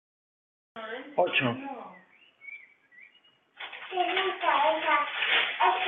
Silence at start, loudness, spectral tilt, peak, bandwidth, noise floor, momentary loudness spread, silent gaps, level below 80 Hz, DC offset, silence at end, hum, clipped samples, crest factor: 0.75 s; -26 LUFS; -0.5 dB/octave; -12 dBFS; 4.2 kHz; -63 dBFS; 20 LU; none; -80 dBFS; under 0.1%; 0 s; none; under 0.1%; 18 dB